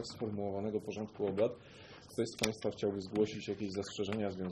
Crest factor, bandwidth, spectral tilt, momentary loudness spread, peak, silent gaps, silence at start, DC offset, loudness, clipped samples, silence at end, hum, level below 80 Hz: 22 dB; 12 kHz; -5 dB/octave; 8 LU; -16 dBFS; none; 0 s; under 0.1%; -38 LUFS; under 0.1%; 0 s; none; -68 dBFS